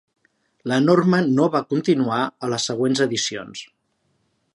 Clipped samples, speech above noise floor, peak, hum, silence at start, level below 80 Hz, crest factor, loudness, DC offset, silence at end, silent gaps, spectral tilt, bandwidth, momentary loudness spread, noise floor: under 0.1%; 49 dB; -4 dBFS; none; 0.65 s; -68 dBFS; 18 dB; -20 LUFS; under 0.1%; 0.9 s; none; -5 dB/octave; 11.5 kHz; 14 LU; -69 dBFS